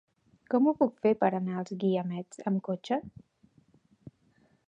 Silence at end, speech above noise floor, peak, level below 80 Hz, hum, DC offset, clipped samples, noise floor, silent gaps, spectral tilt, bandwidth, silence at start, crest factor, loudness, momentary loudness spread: 0.6 s; 38 dB; -12 dBFS; -72 dBFS; none; under 0.1%; under 0.1%; -67 dBFS; none; -8 dB/octave; 9.8 kHz; 0.5 s; 20 dB; -30 LUFS; 9 LU